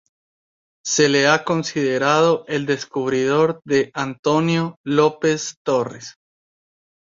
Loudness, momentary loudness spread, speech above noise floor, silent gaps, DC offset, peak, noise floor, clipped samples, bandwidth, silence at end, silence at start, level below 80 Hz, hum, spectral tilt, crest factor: -19 LUFS; 8 LU; over 71 dB; 4.19-4.23 s, 4.77-4.84 s, 5.57-5.65 s; under 0.1%; -2 dBFS; under -90 dBFS; under 0.1%; 7.6 kHz; 0.9 s; 0.85 s; -62 dBFS; none; -4.5 dB/octave; 18 dB